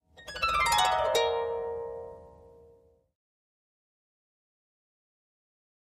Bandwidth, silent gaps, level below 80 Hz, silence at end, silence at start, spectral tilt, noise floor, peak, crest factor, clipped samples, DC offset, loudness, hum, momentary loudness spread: 15 kHz; none; -56 dBFS; 3.65 s; 0.2 s; -1 dB/octave; -61 dBFS; -12 dBFS; 20 dB; under 0.1%; under 0.1%; -27 LUFS; none; 18 LU